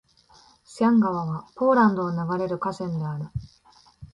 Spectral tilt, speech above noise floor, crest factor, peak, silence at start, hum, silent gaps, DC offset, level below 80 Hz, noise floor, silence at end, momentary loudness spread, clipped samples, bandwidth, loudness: -8 dB/octave; 34 dB; 16 dB; -8 dBFS; 0.7 s; none; none; under 0.1%; -54 dBFS; -57 dBFS; 0.1 s; 13 LU; under 0.1%; 11 kHz; -24 LUFS